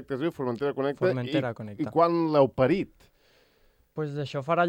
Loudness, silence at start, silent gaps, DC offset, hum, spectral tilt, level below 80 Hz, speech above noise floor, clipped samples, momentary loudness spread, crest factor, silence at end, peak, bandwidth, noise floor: -27 LUFS; 0 s; none; under 0.1%; none; -8 dB/octave; -62 dBFS; 38 dB; under 0.1%; 12 LU; 18 dB; 0 s; -8 dBFS; 15.5 kHz; -64 dBFS